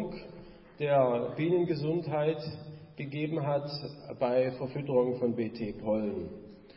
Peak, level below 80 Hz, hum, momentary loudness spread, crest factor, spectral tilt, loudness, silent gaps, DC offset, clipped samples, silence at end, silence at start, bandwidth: -14 dBFS; -62 dBFS; none; 15 LU; 16 dB; -11 dB/octave; -31 LUFS; none; under 0.1%; under 0.1%; 0 s; 0 s; 5.8 kHz